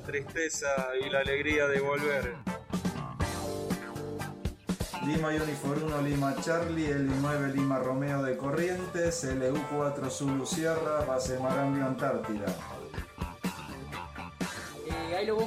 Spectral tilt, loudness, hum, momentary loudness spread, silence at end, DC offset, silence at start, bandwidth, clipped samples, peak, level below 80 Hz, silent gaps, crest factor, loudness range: -5.5 dB/octave; -32 LUFS; none; 9 LU; 0 s; under 0.1%; 0 s; 16 kHz; under 0.1%; -16 dBFS; -50 dBFS; none; 16 dB; 4 LU